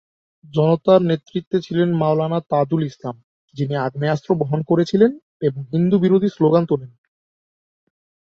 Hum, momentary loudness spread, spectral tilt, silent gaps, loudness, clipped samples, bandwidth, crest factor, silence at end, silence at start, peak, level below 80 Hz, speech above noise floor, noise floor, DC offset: none; 9 LU; -8.5 dB/octave; 1.47-1.51 s, 3.23-3.48 s, 5.23-5.40 s; -19 LUFS; under 0.1%; 7 kHz; 18 dB; 1.45 s; 0.55 s; -2 dBFS; -60 dBFS; over 72 dB; under -90 dBFS; under 0.1%